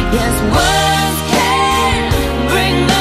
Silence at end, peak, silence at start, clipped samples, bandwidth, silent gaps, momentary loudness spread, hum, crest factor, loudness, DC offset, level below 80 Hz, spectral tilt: 0 s; -2 dBFS; 0 s; under 0.1%; 16 kHz; none; 3 LU; none; 12 dB; -13 LUFS; under 0.1%; -24 dBFS; -4 dB/octave